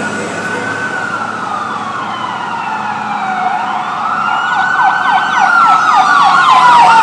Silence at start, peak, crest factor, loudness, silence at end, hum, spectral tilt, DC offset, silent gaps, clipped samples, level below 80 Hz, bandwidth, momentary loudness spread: 0 s; 0 dBFS; 12 dB; -11 LUFS; 0 s; none; -3 dB/octave; under 0.1%; none; 0.2%; -58 dBFS; 11 kHz; 12 LU